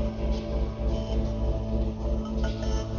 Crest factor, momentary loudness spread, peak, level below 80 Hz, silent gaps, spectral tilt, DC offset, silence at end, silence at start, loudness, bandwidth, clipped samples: 12 dB; 2 LU; -14 dBFS; -30 dBFS; none; -7.5 dB/octave; under 0.1%; 0 s; 0 s; -30 LUFS; 7 kHz; under 0.1%